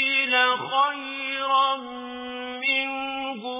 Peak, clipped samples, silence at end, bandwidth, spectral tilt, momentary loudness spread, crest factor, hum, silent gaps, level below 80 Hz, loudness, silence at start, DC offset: -8 dBFS; under 0.1%; 0 s; 3.9 kHz; 1.5 dB/octave; 14 LU; 18 dB; none; none; -68 dBFS; -23 LUFS; 0 s; under 0.1%